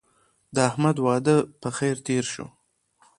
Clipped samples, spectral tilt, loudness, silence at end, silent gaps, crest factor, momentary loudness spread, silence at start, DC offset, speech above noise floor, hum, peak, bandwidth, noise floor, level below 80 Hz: under 0.1%; -5.5 dB/octave; -24 LUFS; 0.75 s; none; 20 dB; 10 LU; 0.55 s; under 0.1%; 42 dB; none; -4 dBFS; 11.5 kHz; -65 dBFS; -62 dBFS